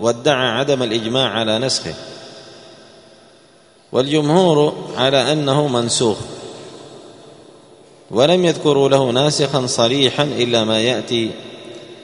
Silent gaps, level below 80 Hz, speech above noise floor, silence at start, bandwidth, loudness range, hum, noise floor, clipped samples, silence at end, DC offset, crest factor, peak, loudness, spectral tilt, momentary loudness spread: none; -56 dBFS; 33 dB; 0 s; 11 kHz; 5 LU; none; -49 dBFS; under 0.1%; 0 s; under 0.1%; 18 dB; 0 dBFS; -16 LUFS; -4.5 dB/octave; 20 LU